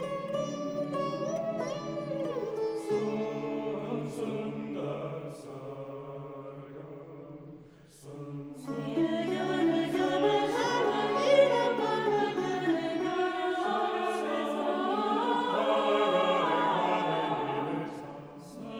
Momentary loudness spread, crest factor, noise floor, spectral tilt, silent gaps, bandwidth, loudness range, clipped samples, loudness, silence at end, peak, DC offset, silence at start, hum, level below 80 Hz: 17 LU; 20 dB; -53 dBFS; -5.5 dB/octave; none; over 20 kHz; 13 LU; under 0.1%; -30 LUFS; 0 s; -12 dBFS; under 0.1%; 0 s; none; -70 dBFS